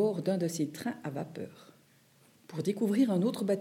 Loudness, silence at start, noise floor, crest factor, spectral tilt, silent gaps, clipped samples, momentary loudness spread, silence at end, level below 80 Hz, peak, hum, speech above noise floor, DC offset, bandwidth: -32 LUFS; 0 s; -64 dBFS; 16 dB; -6.5 dB/octave; none; under 0.1%; 15 LU; 0 s; -84 dBFS; -16 dBFS; none; 32 dB; under 0.1%; 16.5 kHz